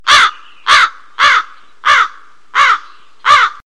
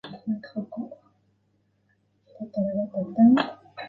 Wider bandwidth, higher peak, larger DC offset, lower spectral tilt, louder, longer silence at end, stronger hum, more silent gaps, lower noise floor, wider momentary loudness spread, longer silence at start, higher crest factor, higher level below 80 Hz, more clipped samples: first, 13 kHz vs 4.6 kHz; first, 0 dBFS vs -8 dBFS; first, 2% vs under 0.1%; second, 1.5 dB/octave vs -8.5 dB/octave; first, -11 LUFS vs -25 LUFS; first, 0.15 s vs 0 s; neither; neither; second, -34 dBFS vs -69 dBFS; second, 9 LU vs 19 LU; about the same, 0.05 s vs 0.05 s; second, 12 dB vs 18 dB; first, -48 dBFS vs -68 dBFS; neither